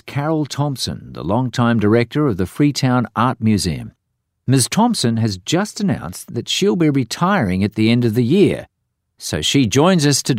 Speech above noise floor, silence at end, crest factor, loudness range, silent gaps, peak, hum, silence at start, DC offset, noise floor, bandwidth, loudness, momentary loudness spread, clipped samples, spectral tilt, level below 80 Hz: 55 dB; 0 s; 14 dB; 2 LU; none; -2 dBFS; none; 0.05 s; under 0.1%; -71 dBFS; 16 kHz; -17 LUFS; 10 LU; under 0.1%; -5 dB/octave; -46 dBFS